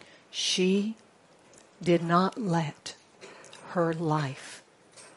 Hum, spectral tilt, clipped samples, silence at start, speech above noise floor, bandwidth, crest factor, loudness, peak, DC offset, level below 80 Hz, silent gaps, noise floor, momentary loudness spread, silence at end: none; -5 dB/octave; under 0.1%; 0.35 s; 31 dB; 11.5 kHz; 22 dB; -28 LUFS; -8 dBFS; under 0.1%; -74 dBFS; none; -58 dBFS; 23 LU; 0.1 s